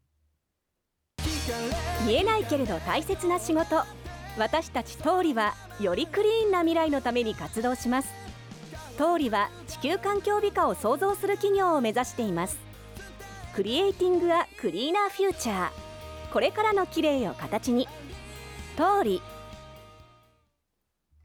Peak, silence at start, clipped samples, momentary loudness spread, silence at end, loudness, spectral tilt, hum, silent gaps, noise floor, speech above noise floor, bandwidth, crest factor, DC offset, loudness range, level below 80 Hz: -12 dBFS; 1.2 s; under 0.1%; 18 LU; 1.3 s; -27 LUFS; -4.5 dB/octave; none; none; -81 dBFS; 55 dB; over 20 kHz; 16 dB; under 0.1%; 3 LU; -48 dBFS